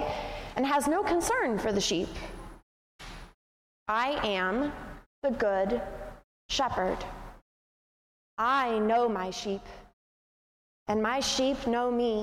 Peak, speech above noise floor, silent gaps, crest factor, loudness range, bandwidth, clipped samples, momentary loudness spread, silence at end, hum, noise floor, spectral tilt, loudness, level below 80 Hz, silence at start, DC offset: -14 dBFS; over 62 dB; 2.63-2.99 s, 3.34-3.86 s, 5.06-5.22 s, 6.24-6.49 s, 7.42-8.37 s, 9.93-10.86 s; 16 dB; 2 LU; 16 kHz; under 0.1%; 20 LU; 0 s; none; under -90 dBFS; -3.5 dB/octave; -29 LUFS; -50 dBFS; 0 s; under 0.1%